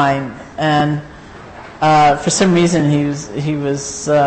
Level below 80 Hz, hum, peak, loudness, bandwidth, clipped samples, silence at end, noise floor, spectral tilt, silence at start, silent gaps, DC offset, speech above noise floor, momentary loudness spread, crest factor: -44 dBFS; none; -4 dBFS; -15 LUFS; 8.8 kHz; under 0.1%; 0 s; -35 dBFS; -5 dB/octave; 0 s; none; under 0.1%; 20 dB; 23 LU; 12 dB